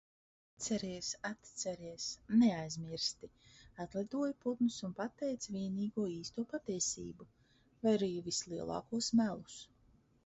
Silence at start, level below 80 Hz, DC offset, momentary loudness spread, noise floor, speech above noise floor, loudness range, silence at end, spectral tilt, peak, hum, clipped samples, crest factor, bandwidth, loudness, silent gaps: 0.6 s; -70 dBFS; under 0.1%; 12 LU; -69 dBFS; 32 dB; 3 LU; 0.6 s; -5 dB/octave; -20 dBFS; none; under 0.1%; 18 dB; 8 kHz; -38 LUFS; none